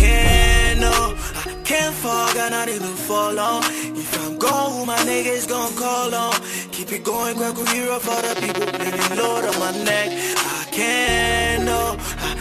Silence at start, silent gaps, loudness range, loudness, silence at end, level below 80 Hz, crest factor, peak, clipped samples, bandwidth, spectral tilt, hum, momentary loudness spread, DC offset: 0 s; none; 2 LU; -20 LUFS; 0 s; -26 dBFS; 18 dB; -2 dBFS; under 0.1%; 15 kHz; -3 dB/octave; none; 7 LU; under 0.1%